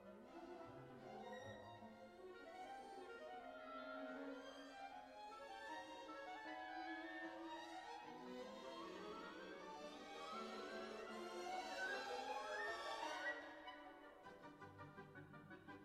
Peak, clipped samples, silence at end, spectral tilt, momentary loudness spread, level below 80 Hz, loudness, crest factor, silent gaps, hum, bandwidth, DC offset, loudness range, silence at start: -36 dBFS; under 0.1%; 0 s; -3.5 dB/octave; 13 LU; -84 dBFS; -53 LUFS; 18 dB; none; none; 14.5 kHz; under 0.1%; 7 LU; 0 s